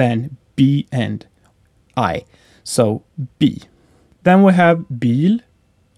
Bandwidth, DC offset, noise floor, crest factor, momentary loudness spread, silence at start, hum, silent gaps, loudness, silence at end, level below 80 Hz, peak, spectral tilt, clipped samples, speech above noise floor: 13.5 kHz; under 0.1%; -56 dBFS; 16 dB; 16 LU; 0 s; none; none; -17 LUFS; 0.6 s; -54 dBFS; 0 dBFS; -6.5 dB/octave; under 0.1%; 40 dB